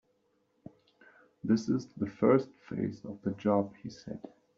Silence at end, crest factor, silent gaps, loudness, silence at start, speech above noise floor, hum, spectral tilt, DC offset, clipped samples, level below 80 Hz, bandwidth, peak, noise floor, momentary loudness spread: 0.4 s; 20 dB; none; -32 LUFS; 1.45 s; 43 dB; none; -7.5 dB/octave; under 0.1%; under 0.1%; -70 dBFS; 7.6 kHz; -12 dBFS; -74 dBFS; 18 LU